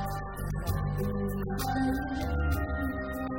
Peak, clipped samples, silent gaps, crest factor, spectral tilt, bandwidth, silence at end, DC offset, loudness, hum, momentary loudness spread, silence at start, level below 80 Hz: -16 dBFS; under 0.1%; none; 14 dB; -6.5 dB/octave; 16.5 kHz; 0 s; 0.1%; -32 LUFS; none; 5 LU; 0 s; -36 dBFS